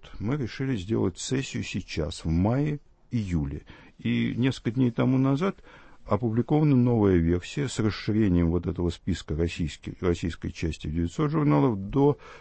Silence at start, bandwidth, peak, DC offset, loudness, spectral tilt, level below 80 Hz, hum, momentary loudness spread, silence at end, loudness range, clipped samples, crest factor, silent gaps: 0 s; 8.8 kHz; -8 dBFS; under 0.1%; -27 LUFS; -7 dB/octave; -42 dBFS; none; 10 LU; 0 s; 4 LU; under 0.1%; 18 dB; none